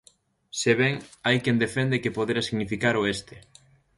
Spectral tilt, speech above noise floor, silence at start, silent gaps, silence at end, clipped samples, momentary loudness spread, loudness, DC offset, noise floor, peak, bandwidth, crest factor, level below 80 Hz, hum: -5 dB/octave; 35 dB; 0.55 s; none; 0.6 s; under 0.1%; 6 LU; -25 LUFS; under 0.1%; -60 dBFS; -6 dBFS; 11.5 kHz; 20 dB; -58 dBFS; none